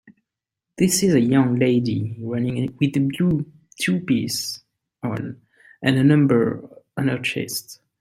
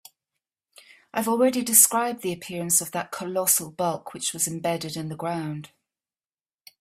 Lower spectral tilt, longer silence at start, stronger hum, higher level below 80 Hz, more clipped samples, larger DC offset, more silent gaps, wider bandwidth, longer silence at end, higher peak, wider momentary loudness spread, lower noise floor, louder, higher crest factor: first, -5.5 dB/octave vs -3 dB/octave; second, 0.05 s vs 1.15 s; neither; first, -58 dBFS vs -70 dBFS; neither; neither; neither; about the same, 16 kHz vs 16 kHz; second, 0.25 s vs 1.15 s; second, -4 dBFS vs 0 dBFS; about the same, 13 LU vs 15 LU; second, -84 dBFS vs under -90 dBFS; about the same, -21 LUFS vs -23 LUFS; second, 18 dB vs 26 dB